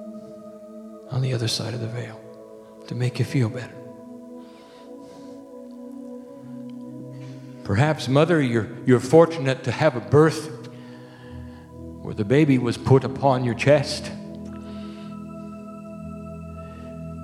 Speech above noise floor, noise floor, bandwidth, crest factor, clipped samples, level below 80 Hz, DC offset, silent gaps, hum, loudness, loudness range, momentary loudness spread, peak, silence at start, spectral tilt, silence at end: 24 dB; -44 dBFS; 13 kHz; 22 dB; under 0.1%; -54 dBFS; under 0.1%; none; none; -21 LUFS; 16 LU; 23 LU; -2 dBFS; 0 s; -6.5 dB/octave; 0 s